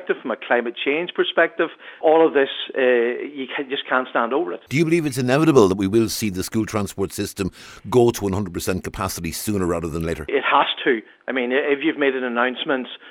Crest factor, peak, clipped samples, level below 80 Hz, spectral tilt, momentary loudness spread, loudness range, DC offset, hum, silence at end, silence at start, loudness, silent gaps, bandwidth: 20 dB; 0 dBFS; under 0.1%; -48 dBFS; -5 dB/octave; 9 LU; 4 LU; under 0.1%; none; 0 s; 0 s; -21 LUFS; none; 19.5 kHz